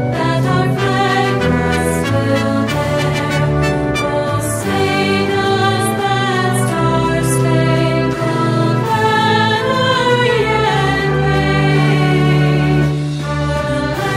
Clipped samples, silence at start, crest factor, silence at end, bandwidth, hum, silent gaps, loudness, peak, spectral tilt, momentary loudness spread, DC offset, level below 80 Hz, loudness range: under 0.1%; 0 s; 12 dB; 0 s; 15.5 kHz; none; none; -14 LUFS; -2 dBFS; -5.5 dB/octave; 4 LU; under 0.1%; -34 dBFS; 2 LU